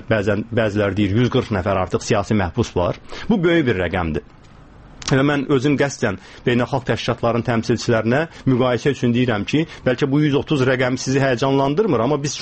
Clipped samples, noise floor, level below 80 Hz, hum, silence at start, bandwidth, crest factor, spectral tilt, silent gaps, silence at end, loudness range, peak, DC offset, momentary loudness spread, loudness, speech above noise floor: under 0.1%; -43 dBFS; -42 dBFS; none; 0 s; 8.6 kHz; 16 dB; -6 dB/octave; none; 0 s; 2 LU; -4 dBFS; 0.2%; 4 LU; -19 LUFS; 25 dB